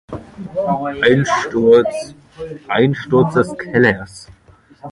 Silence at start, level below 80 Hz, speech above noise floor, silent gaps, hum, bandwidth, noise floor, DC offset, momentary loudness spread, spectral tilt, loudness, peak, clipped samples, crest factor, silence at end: 0.1 s; -48 dBFS; 25 dB; none; none; 11.5 kHz; -40 dBFS; under 0.1%; 20 LU; -6 dB/octave; -15 LUFS; 0 dBFS; under 0.1%; 16 dB; 0 s